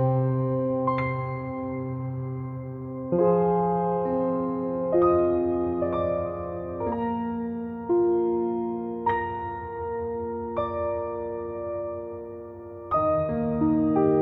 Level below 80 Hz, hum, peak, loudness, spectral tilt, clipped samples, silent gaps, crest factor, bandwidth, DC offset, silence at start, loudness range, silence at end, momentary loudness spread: -52 dBFS; none; -10 dBFS; -27 LUFS; -12 dB/octave; under 0.1%; none; 16 dB; 4.4 kHz; under 0.1%; 0 s; 6 LU; 0 s; 11 LU